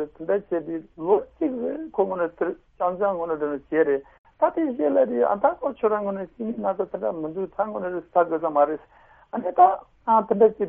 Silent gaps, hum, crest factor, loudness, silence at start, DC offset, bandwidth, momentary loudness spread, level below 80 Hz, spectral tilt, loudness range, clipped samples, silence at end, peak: 4.19-4.24 s; none; 20 dB; -24 LUFS; 0 s; under 0.1%; 3.6 kHz; 10 LU; -60 dBFS; -6.5 dB/octave; 3 LU; under 0.1%; 0 s; -4 dBFS